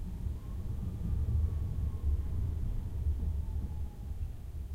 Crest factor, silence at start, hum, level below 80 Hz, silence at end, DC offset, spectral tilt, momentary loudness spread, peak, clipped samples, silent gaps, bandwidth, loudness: 12 dB; 0 s; none; -36 dBFS; 0 s; under 0.1%; -9 dB/octave; 8 LU; -22 dBFS; under 0.1%; none; 4.4 kHz; -37 LUFS